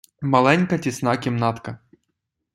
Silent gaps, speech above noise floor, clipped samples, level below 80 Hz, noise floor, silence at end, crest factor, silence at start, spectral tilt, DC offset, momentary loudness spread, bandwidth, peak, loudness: none; 57 dB; under 0.1%; -60 dBFS; -78 dBFS; 0.8 s; 20 dB; 0.2 s; -6 dB/octave; under 0.1%; 18 LU; 13.5 kHz; -2 dBFS; -20 LUFS